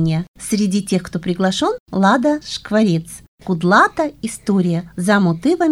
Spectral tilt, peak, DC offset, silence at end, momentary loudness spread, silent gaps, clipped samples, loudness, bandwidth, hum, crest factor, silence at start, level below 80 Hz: -5.5 dB/octave; 0 dBFS; under 0.1%; 0 s; 9 LU; 0.28-0.34 s, 1.80-1.86 s, 3.28-3.38 s; under 0.1%; -17 LUFS; 15 kHz; none; 16 dB; 0 s; -48 dBFS